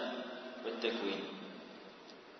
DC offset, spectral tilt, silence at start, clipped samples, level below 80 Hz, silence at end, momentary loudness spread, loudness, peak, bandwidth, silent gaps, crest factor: under 0.1%; -1.5 dB/octave; 0 s; under 0.1%; -86 dBFS; 0 s; 16 LU; -41 LUFS; -22 dBFS; 6.2 kHz; none; 20 dB